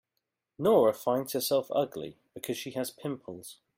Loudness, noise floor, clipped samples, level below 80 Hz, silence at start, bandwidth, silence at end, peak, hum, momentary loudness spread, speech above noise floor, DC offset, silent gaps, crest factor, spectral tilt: -29 LUFS; -84 dBFS; under 0.1%; -72 dBFS; 0.6 s; 16.5 kHz; 0.25 s; -10 dBFS; none; 18 LU; 55 dB; under 0.1%; none; 20 dB; -4.5 dB/octave